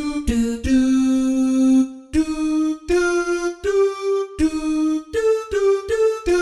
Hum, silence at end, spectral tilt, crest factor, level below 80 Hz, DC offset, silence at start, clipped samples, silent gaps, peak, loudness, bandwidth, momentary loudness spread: none; 0 s; -5.5 dB/octave; 12 dB; -36 dBFS; under 0.1%; 0 s; under 0.1%; none; -8 dBFS; -19 LUFS; 12 kHz; 5 LU